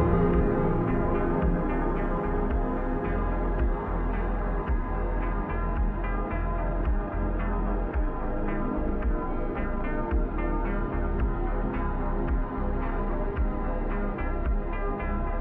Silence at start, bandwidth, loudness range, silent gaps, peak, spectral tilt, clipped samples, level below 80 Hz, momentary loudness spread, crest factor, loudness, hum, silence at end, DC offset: 0 s; 3.6 kHz; 3 LU; none; -10 dBFS; -11 dB/octave; under 0.1%; -28 dBFS; 5 LU; 16 dB; -30 LUFS; none; 0 s; under 0.1%